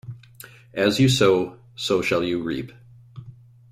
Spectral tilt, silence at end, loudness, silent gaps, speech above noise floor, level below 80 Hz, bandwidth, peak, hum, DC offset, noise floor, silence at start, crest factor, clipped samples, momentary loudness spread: -5 dB/octave; 0.4 s; -22 LUFS; none; 25 dB; -54 dBFS; 15.5 kHz; -4 dBFS; none; under 0.1%; -46 dBFS; 0.05 s; 20 dB; under 0.1%; 24 LU